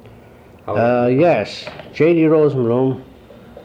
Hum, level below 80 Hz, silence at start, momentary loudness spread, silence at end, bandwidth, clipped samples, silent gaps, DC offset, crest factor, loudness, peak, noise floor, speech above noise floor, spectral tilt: none; -54 dBFS; 0.05 s; 17 LU; 0.05 s; 8.8 kHz; under 0.1%; none; under 0.1%; 14 dB; -16 LUFS; -4 dBFS; -43 dBFS; 28 dB; -8 dB/octave